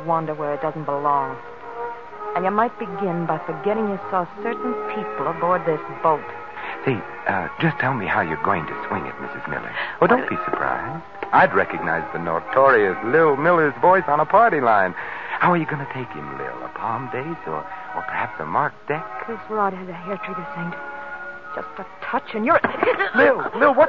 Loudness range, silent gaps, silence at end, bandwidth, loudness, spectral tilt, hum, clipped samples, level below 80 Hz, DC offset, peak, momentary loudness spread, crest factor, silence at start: 9 LU; none; 0 s; 6.8 kHz; -21 LUFS; -8.5 dB/octave; none; under 0.1%; -58 dBFS; 0.6%; -4 dBFS; 15 LU; 18 dB; 0 s